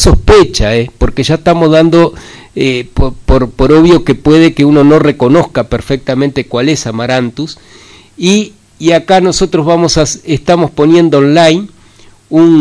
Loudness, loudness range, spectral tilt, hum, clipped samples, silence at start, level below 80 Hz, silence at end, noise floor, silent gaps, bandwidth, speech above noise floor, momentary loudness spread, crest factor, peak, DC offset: -9 LUFS; 5 LU; -5.5 dB/octave; none; 2%; 0 s; -20 dBFS; 0 s; -39 dBFS; none; 11 kHz; 32 dB; 9 LU; 8 dB; 0 dBFS; under 0.1%